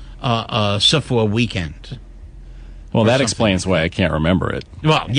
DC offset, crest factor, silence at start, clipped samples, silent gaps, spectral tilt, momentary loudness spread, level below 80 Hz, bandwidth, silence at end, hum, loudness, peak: under 0.1%; 16 dB; 0 s; under 0.1%; none; -5 dB/octave; 11 LU; -36 dBFS; 10.5 kHz; 0 s; none; -17 LUFS; -4 dBFS